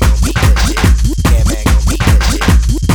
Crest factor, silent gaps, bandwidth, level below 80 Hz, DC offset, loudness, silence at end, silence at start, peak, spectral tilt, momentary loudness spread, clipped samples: 10 dB; none; 18.5 kHz; -12 dBFS; under 0.1%; -12 LUFS; 0 s; 0 s; 0 dBFS; -5 dB/octave; 1 LU; under 0.1%